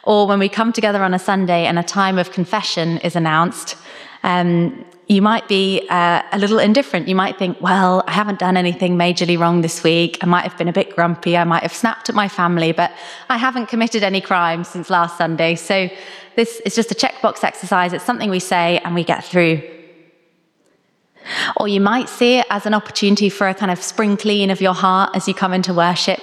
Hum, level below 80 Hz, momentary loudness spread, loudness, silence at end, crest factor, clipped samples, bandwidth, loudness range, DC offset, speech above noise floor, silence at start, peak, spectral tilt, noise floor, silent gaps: none; -68 dBFS; 5 LU; -17 LUFS; 0 s; 16 dB; under 0.1%; 13.5 kHz; 3 LU; under 0.1%; 44 dB; 0.05 s; -2 dBFS; -5 dB/octave; -60 dBFS; none